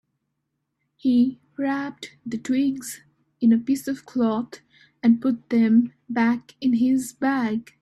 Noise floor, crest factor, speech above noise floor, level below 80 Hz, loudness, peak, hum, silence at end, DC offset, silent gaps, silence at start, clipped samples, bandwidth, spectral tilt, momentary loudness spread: -78 dBFS; 16 dB; 56 dB; -66 dBFS; -23 LUFS; -8 dBFS; none; 0.2 s; under 0.1%; none; 1.05 s; under 0.1%; 13 kHz; -5.5 dB/octave; 13 LU